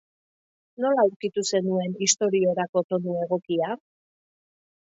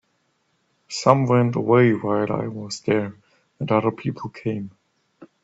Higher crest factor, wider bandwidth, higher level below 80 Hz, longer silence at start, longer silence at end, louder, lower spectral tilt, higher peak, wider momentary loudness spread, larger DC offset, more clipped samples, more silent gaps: about the same, 20 dB vs 22 dB; about the same, 8 kHz vs 8 kHz; second, -74 dBFS vs -62 dBFS; about the same, 0.8 s vs 0.9 s; first, 1.1 s vs 0.2 s; second, -24 LUFS vs -21 LUFS; second, -4 dB/octave vs -6.5 dB/octave; second, -6 dBFS vs 0 dBFS; second, 6 LU vs 15 LU; neither; neither; first, 1.16-1.20 s, 2.69-2.73 s, 2.84-2.89 s vs none